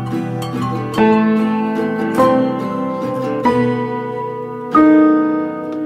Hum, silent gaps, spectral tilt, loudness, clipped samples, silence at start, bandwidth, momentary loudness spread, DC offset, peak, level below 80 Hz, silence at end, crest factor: none; none; -7.5 dB/octave; -16 LUFS; under 0.1%; 0 s; 13.5 kHz; 11 LU; under 0.1%; 0 dBFS; -52 dBFS; 0 s; 14 dB